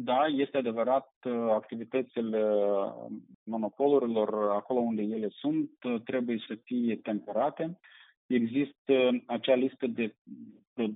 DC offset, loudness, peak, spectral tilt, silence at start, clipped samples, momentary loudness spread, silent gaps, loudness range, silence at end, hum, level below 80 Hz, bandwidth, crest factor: under 0.1%; -30 LUFS; -12 dBFS; -4.5 dB/octave; 0 s; under 0.1%; 11 LU; 1.16-1.21 s, 3.35-3.46 s, 8.17-8.29 s, 8.78-8.85 s, 10.18-10.25 s, 10.67-10.76 s; 3 LU; 0 s; none; -84 dBFS; 4 kHz; 18 dB